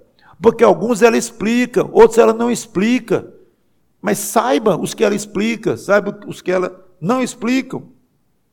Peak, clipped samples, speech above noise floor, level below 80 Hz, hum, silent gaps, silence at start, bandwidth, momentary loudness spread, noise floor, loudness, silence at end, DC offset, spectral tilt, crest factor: 0 dBFS; under 0.1%; 47 dB; -54 dBFS; none; none; 0.4 s; 18 kHz; 10 LU; -62 dBFS; -16 LUFS; 0.7 s; under 0.1%; -5 dB/octave; 16 dB